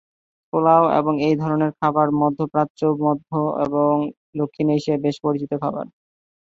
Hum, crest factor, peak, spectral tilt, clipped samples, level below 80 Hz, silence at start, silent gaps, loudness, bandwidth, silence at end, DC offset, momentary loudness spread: none; 18 dB; -2 dBFS; -8.5 dB/octave; under 0.1%; -62 dBFS; 0.55 s; 2.70-2.75 s, 4.17-4.33 s; -20 LUFS; 7.6 kHz; 0.7 s; under 0.1%; 10 LU